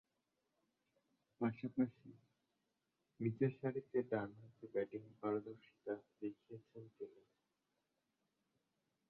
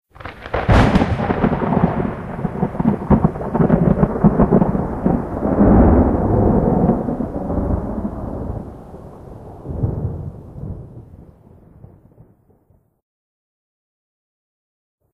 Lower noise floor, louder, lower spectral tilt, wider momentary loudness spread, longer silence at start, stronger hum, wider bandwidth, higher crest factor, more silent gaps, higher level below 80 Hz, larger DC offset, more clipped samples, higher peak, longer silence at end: first, -88 dBFS vs -57 dBFS; second, -44 LUFS vs -17 LUFS; about the same, -8.5 dB/octave vs -9.5 dB/octave; about the same, 18 LU vs 20 LU; first, 1.4 s vs 0.2 s; neither; second, 4.8 kHz vs 9.6 kHz; about the same, 22 dB vs 18 dB; neither; second, -84 dBFS vs -28 dBFS; neither; neither; second, -24 dBFS vs 0 dBFS; second, 2 s vs 3.95 s